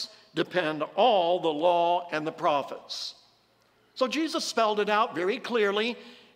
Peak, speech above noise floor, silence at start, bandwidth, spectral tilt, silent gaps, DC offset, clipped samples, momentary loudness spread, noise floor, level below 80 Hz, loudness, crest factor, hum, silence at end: -10 dBFS; 38 dB; 0 s; 16 kHz; -3.5 dB/octave; none; under 0.1%; under 0.1%; 11 LU; -65 dBFS; -78 dBFS; -27 LUFS; 18 dB; none; 0.2 s